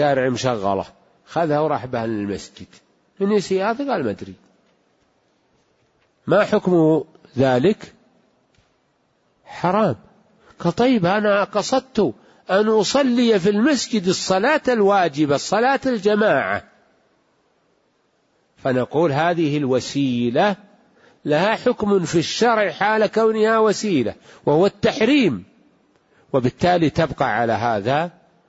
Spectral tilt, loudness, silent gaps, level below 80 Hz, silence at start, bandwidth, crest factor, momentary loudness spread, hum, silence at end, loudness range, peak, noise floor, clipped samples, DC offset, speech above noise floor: -5.5 dB/octave; -19 LUFS; none; -54 dBFS; 0 s; 8 kHz; 14 dB; 10 LU; none; 0.4 s; 6 LU; -6 dBFS; -64 dBFS; under 0.1%; under 0.1%; 46 dB